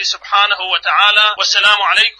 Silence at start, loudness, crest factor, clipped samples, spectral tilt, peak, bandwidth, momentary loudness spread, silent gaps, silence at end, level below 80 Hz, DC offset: 0 s; -11 LUFS; 14 dB; under 0.1%; 3 dB/octave; 0 dBFS; 10.5 kHz; 5 LU; none; 0.1 s; -58 dBFS; under 0.1%